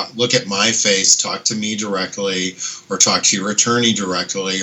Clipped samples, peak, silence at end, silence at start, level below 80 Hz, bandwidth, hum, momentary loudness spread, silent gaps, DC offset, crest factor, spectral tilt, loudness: under 0.1%; 0 dBFS; 0 s; 0 s; -68 dBFS; 19.5 kHz; none; 9 LU; none; under 0.1%; 18 dB; -1.5 dB/octave; -15 LUFS